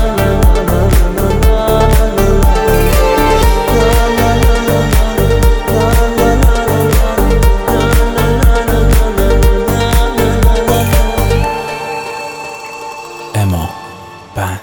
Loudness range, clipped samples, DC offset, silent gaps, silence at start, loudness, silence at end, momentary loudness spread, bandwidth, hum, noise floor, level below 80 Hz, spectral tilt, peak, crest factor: 5 LU; under 0.1%; 0.3%; none; 0 s; -12 LUFS; 0 s; 11 LU; over 20 kHz; none; -31 dBFS; -12 dBFS; -5.5 dB/octave; 0 dBFS; 10 dB